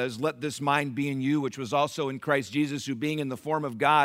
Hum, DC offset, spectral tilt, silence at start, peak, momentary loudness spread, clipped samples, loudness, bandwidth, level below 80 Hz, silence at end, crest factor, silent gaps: none; under 0.1%; -5.5 dB/octave; 0 s; -8 dBFS; 4 LU; under 0.1%; -28 LUFS; 16 kHz; -72 dBFS; 0 s; 20 dB; none